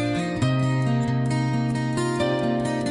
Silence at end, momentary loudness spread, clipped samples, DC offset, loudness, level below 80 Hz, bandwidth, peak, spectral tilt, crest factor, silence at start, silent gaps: 0 s; 2 LU; under 0.1%; under 0.1%; -24 LUFS; -50 dBFS; 11 kHz; -14 dBFS; -6.5 dB/octave; 10 dB; 0 s; none